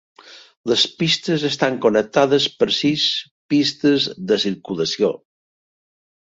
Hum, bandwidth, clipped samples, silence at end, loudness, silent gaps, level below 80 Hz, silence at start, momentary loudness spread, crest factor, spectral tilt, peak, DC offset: none; 7.8 kHz; under 0.1%; 1.15 s; -19 LUFS; 0.57-0.64 s, 3.31-3.49 s; -62 dBFS; 0.25 s; 6 LU; 18 dB; -4.5 dB/octave; -2 dBFS; under 0.1%